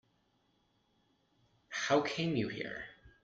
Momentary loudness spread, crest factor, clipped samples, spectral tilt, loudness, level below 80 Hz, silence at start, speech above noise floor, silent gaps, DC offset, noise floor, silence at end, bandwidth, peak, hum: 13 LU; 22 dB; under 0.1%; -5 dB/octave; -35 LUFS; -70 dBFS; 1.7 s; 41 dB; none; under 0.1%; -75 dBFS; 0.15 s; 8 kHz; -18 dBFS; none